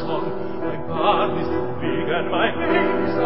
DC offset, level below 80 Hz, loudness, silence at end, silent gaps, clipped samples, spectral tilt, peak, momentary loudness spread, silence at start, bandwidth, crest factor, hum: 4%; -44 dBFS; -22 LUFS; 0 s; none; under 0.1%; -10.5 dB/octave; -4 dBFS; 8 LU; 0 s; 5.8 kHz; 16 dB; none